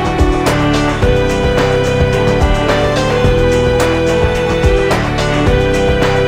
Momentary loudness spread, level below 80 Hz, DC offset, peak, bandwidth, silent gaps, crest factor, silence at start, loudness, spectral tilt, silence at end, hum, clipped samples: 2 LU; -20 dBFS; under 0.1%; 0 dBFS; 15.5 kHz; none; 12 dB; 0 s; -12 LUFS; -6 dB/octave; 0 s; none; under 0.1%